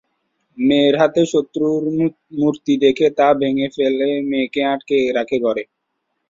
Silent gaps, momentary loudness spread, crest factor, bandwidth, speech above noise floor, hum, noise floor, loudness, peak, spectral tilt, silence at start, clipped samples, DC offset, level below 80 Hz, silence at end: none; 6 LU; 16 dB; 7.6 kHz; 57 dB; none; -73 dBFS; -17 LUFS; -2 dBFS; -6 dB/octave; 0.55 s; under 0.1%; under 0.1%; -58 dBFS; 0.65 s